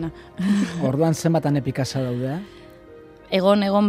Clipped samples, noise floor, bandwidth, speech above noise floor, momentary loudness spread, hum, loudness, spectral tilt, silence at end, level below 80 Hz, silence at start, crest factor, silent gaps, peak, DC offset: under 0.1%; -45 dBFS; 15 kHz; 24 dB; 11 LU; none; -22 LUFS; -6.5 dB/octave; 0 s; -54 dBFS; 0 s; 18 dB; none; -4 dBFS; under 0.1%